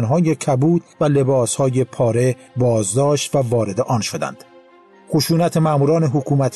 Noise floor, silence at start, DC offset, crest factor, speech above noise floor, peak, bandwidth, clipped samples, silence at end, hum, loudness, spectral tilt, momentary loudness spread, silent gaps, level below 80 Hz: -47 dBFS; 0 s; under 0.1%; 10 dB; 31 dB; -6 dBFS; 12.5 kHz; under 0.1%; 0 s; none; -18 LUFS; -6 dB/octave; 4 LU; none; -54 dBFS